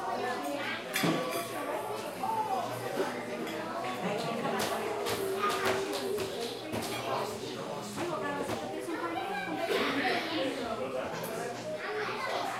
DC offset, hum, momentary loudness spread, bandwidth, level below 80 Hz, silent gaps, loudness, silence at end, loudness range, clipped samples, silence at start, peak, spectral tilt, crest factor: under 0.1%; none; 7 LU; 16 kHz; -68 dBFS; none; -34 LUFS; 0 s; 2 LU; under 0.1%; 0 s; -16 dBFS; -4 dB/octave; 18 dB